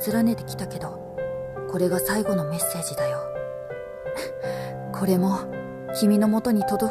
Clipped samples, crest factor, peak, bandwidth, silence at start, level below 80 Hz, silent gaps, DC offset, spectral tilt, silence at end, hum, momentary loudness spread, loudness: under 0.1%; 14 dB; -10 dBFS; 14.5 kHz; 0 s; -54 dBFS; none; under 0.1%; -5.5 dB/octave; 0 s; none; 12 LU; -26 LUFS